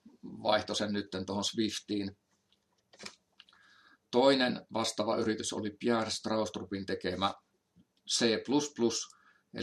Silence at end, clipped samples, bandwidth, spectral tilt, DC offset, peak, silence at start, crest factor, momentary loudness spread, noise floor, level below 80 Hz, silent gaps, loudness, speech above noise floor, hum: 0 s; under 0.1%; 13 kHz; -3.5 dB/octave; under 0.1%; -12 dBFS; 0.05 s; 22 dB; 18 LU; -75 dBFS; -76 dBFS; none; -32 LUFS; 43 dB; none